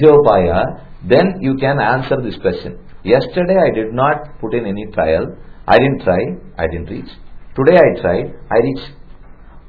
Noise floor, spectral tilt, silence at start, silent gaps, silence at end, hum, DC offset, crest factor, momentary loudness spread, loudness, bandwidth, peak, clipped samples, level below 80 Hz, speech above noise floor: -36 dBFS; -9.5 dB/octave; 0 s; none; 0.1 s; none; under 0.1%; 14 dB; 16 LU; -15 LUFS; 5.4 kHz; 0 dBFS; 0.1%; -36 dBFS; 22 dB